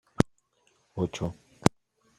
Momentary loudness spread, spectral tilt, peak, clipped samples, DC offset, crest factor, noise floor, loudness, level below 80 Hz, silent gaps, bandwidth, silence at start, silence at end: 8 LU; -6 dB/octave; -2 dBFS; under 0.1%; under 0.1%; 30 dB; -69 dBFS; -31 LUFS; -52 dBFS; none; 14.5 kHz; 0.2 s; 0.5 s